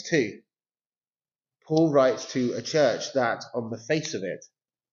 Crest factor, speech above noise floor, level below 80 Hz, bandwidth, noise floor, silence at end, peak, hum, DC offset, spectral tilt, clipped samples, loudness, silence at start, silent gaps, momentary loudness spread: 20 dB; over 65 dB; -76 dBFS; 7.4 kHz; under -90 dBFS; 0.5 s; -8 dBFS; none; under 0.1%; -4.5 dB/octave; under 0.1%; -26 LUFS; 0 s; none; 12 LU